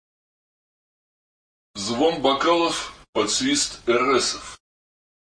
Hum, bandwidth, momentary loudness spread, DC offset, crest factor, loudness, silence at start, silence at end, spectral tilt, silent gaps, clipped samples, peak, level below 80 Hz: none; 10.5 kHz; 12 LU; under 0.1%; 18 dB; -21 LUFS; 1.75 s; 0.65 s; -2.5 dB/octave; 3.09-3.13 s; under 0.1%; -6 dBFS; -56 dBFS